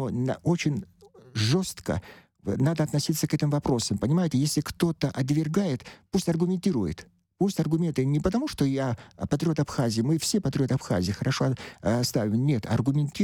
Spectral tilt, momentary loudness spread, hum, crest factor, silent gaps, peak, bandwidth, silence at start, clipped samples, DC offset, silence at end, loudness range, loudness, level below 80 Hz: -6 dB/octave; 6 LU; none; 16 dB; none; -10 dBFS; 19 kHz; 0 s; under 0.1%; under 0.1%; 0 s; 1 LU; -27 LUFS; -50 dBFS